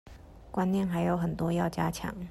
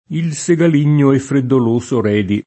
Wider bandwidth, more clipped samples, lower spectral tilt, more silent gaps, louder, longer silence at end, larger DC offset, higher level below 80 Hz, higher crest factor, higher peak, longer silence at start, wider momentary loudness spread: first, 13 kHz vs 8.8 kHz; neither; about the same, -7 dB/octave vs -7 dB/octave; neither; second, -30 LUFS vs -14 LUFS; about the same, 0 s vs 0.05 s; neither; about the same, -50 dBFS vs -54 dBFS; about the same, 16 dB vs 12 dB; second, -14 dBFS vs -2 dBFS; about the same, 0.05 s vs 0.1 s; about the same, 5 LU vs 4 LU